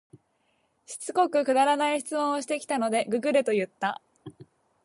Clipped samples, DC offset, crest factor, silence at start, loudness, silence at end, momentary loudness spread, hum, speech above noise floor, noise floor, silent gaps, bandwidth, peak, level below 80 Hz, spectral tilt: under 0.1%; under 0.1%; 18 dB; 0.9 s; -26 LUFS; 0.4 s; 9 LU; none; 45 dB; -71 dBFS; none; 11.5 kHz; -10 dBFS; -78 dBFS; -3.5 dB/octave